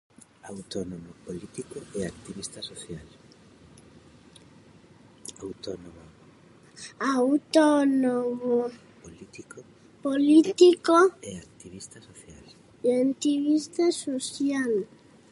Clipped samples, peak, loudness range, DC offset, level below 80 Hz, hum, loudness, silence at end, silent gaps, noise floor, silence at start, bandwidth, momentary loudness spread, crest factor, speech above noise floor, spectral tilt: under 0.1%; -6 dBFS; 20 LU; under 0.1%; -64 dBFS; none; -24 LUFS; 0.45 s; none; -54 dBFS; 0.45 s; 11.5 kHz; 24 LU; 22 dB; 29 dB; -4.5 dB/octave